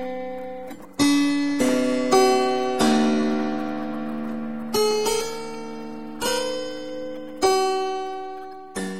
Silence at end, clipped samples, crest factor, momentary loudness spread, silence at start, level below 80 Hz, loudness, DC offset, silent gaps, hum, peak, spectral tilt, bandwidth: 0 s; under 0.1%; 18 dB; 15 LU; 0 s; -58 dBFS; -23 LUFS; 1%; none; none; -4 dBFS; -3.5 dB/octave; 16 kHz